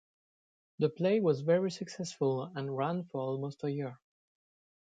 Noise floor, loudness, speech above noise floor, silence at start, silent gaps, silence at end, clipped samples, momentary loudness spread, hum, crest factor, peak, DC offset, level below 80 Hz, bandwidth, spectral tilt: under -90 dBFS; -33 LUFS; over 58 dB; 0.8 s; none; 0.85 s; under 0.1%; 10 LU; none; 18 dB; -16 dBFS; under 0.1%; -80 dBFS; 9.2 kHz; -7 dB/octave